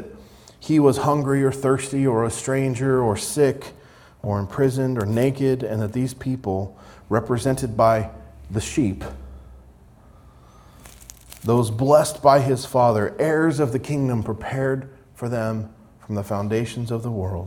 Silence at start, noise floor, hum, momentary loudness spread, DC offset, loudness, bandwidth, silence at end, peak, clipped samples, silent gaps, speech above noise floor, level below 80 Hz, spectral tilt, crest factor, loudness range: 0 s; -49 dBFS; none; 16 LU; under 0.1%; -22 LUFS; 18 kHz; 0 s; -4 dBFS; under 0.1%; none; 28 dB; -48 dBFS; -6.5 dB/octave; 18 dB; 7 LU